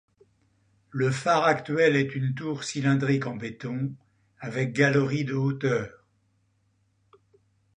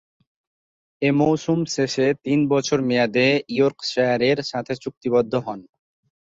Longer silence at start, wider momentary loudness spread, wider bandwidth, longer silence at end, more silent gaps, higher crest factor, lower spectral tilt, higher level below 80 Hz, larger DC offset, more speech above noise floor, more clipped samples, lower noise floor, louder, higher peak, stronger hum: about the same, 0.95 s vs 1 s; first, 12 LU vs 9 LU; first, 10 kHz vs 7.8 kHz; first, 1.85 s vs 0.6 s; second, none vs 4.97-5.01 s; about the same, 20 dB vs 16 dB; about the same, -6 dB/octave vs -5.5 dB/octave; about the same, -66 dBFS vs -62 dBFS; neither; second, 44 dB vs over 70 dB; neither; second, -69 dBFS vs under -90 dBFS; second, -26 LUFS vs -21 LUFS; about the same, -8 dBFS vs -6 dBFS; neither